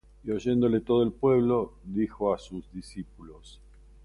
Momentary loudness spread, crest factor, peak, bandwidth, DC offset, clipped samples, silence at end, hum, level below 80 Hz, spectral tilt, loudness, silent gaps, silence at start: 18 LU; 16 dB; -12 dBFS; 11.5 kHz; under 0.1%; under 0.1%; 0.55 s; none; -52 dBFS; -8 dB/octave; -27 LUFS; none; 0.25 s